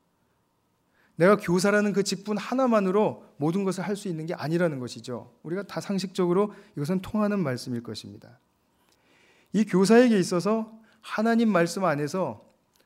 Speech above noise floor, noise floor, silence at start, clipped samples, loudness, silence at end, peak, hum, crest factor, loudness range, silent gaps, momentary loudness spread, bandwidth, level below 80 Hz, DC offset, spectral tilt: 46 dB; -71 dBFS; 1.2 s; under 0.1%; -25 LUFS; 0.5 s; -8 dBFS; none; 18 dB; 6 LU; none; 13 LU; 16 kHz; -66 dBFS; under 0.1%; -6 dB/octave